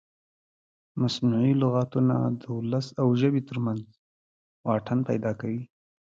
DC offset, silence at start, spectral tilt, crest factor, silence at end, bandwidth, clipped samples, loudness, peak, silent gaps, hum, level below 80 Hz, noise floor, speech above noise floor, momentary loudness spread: under 0.1%; 0.95 s; -8 dB/octave; 16 dB; 0.4 s; 7.6 kHz; under 0.1%; -27 LUFS; -10 dBFS; 3.99-4.64 s; none; -64 dBFS; under -90 dBFS; over 65 dB; 12 LU